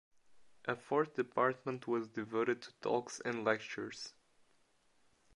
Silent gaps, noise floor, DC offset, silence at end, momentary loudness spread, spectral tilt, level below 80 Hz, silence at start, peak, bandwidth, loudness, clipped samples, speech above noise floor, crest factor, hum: none; -74 dBFS; under 0.1%; 1.25 s; 10 LU; -5 dB/octave; -82 dBFS; 0.3 s; -16 dBFS; 11.5 kHz; -38 LUFS; under 0.1%; 37 dB; 24 dB; none